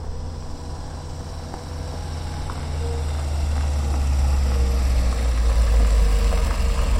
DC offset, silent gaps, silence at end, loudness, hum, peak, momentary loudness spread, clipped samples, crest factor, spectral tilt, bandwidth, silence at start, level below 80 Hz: under 0.1%; none; 0 s; -24 LUFS; none; -8 dBFS; 13 LU; under 0.1%; 12 dB; -5.5 dB/octave; 13 kHz; 0 s; -22 dBFS